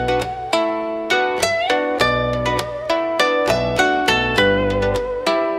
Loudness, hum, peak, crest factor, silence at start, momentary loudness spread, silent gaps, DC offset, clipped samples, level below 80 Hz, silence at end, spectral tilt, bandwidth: -18 LUFS; none; -2 dBFS; 16 dB; 0 s; 5 LU; none; under 0.1%; under 0.1%; -38 dBFS; 0 s; -4 dB/octave; 16 kHz